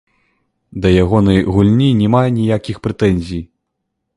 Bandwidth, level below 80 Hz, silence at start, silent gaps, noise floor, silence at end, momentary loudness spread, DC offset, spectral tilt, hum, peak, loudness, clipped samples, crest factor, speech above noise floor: 11 kHz; -32 dBFS; 0.75 s; none; -73 dBFS; 0.75 s; 11 LU; under 0.1%; -8 dB/octave; none; 0 dBFS; -14 LUFS; under 0.1%; 14 dB; 60 dB